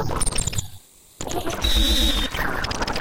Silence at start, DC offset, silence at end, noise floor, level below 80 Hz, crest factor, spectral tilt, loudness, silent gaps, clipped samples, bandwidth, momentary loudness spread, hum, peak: 0 s; under 0.1%; 0 s; -45 dBFS; -26 dBFS; 16 dB; -3 dB/octave; -23 LUFS; none; under 0.1%; 17 kHz; 12 LU; none; -8 dBFS